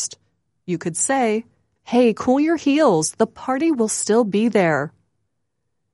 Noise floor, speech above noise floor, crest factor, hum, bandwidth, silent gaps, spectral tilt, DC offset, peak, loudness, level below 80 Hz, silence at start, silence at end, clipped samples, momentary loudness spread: -76 dBFS; 58 dB; 16 dB; none; 11.5 kHz; none; -4.5 dB/octave; under 0.1%; -4 dBFS; -19 LUFS; -62 dBFS; 0 s; 1.05 s; under 0.1%; 10 LU